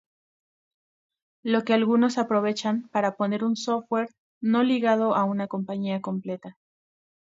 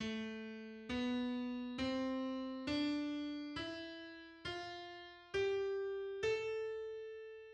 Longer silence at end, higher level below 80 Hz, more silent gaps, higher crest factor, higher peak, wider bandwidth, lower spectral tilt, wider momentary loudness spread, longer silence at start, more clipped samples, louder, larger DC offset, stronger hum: first, 0.8 s vs 0 s; second, -76 dBFS vs -68 dBFS; first, 4.18-4.41 s vs none; about the same, 18 dB vs 14 dB; first, -8 dBFS vs -28 dBFS; second, 7.8 kHz vs 9.4 kHz; about the same, -6 dB/octave vs -5 dB/octave; about the same, 9 LU vs 11 LU; first, 1.45 s vs 0 s; neither; first, -25 LUFS vs -42 LUFS; neither; neither